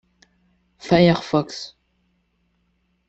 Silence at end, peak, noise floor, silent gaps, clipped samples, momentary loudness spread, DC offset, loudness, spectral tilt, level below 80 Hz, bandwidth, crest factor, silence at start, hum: 1.4 s; -2 dBFS; -68 dBFS; none; under 0.1%; 22 LU; under 0.1%; -19 LUFS; -6.5 dB/octave; -54 dBFS; 8 kHz; 22 dB; 0.85 s; none